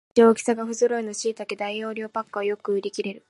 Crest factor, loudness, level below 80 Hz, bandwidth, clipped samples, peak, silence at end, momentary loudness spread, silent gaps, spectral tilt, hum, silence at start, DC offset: 20 dB; -25 LUFS; -76 dBFS; 11.5 kHz; under 0.1%; -4 dBFS; 0.1 s; 12 LU; none; -4 dB/octave; none; 0.15 s; under 0.1%